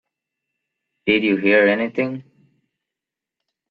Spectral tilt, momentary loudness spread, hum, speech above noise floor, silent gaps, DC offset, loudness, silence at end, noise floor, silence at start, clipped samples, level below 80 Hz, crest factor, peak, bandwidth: -8 dB/octave; 12 LU; none; 68 dB; none; under 0.1%; -18 LUFS; 1.5 s; -86 dBFS; 1.05 s; under 0.1%; -64 dBFS; 20 dB; -2 dBFS; 5.2 kHz